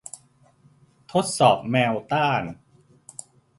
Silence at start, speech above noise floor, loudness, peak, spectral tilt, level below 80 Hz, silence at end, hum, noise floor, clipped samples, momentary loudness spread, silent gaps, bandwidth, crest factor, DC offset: 1.1 s; 36 dB; -22 LUFS; -4 dBFS; -4.5 dB/octave; -62 dBFS; 1.05 s; none; -58 dBFS; under 0.1%; 22 LU; none; 11.5 kHz; 22 dB; under 0.1%